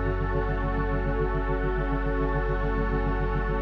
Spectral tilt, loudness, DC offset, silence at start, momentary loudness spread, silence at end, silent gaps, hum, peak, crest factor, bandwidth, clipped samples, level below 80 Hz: -9.5 dB/octave; -28 LUFS; under 0.1%; 0 s; 1 LU; 0 s; none; none; -14 dBFS; 12 dB; 4.7 kHz; under 0.1%; -28 dBFS